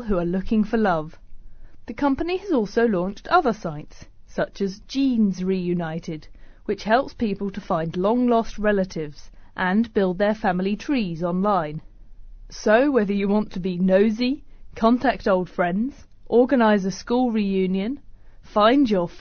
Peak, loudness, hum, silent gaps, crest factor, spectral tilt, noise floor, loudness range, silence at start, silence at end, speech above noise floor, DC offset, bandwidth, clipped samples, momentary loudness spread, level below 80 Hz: -4 dBFS; -22 LUFS; none; none; 18 dB; -5.5 dB/octave; -41 dBFS; 3 LU; 0 s; 0 s; 19 dB; under 0.1%; 6.6 kHz; under 0.1%; 12 LU; -42 dBFS